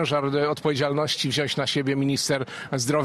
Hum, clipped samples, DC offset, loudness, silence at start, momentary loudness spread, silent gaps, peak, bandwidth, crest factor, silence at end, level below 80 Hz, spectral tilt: none; under 0.1%; under 0.1%; -24 LUFS; 0 s; 3 LU; none; -10 dBFS; 14.5 kHz; 14 dB; 0 s; -62 dBFS; -4.5 dB/octave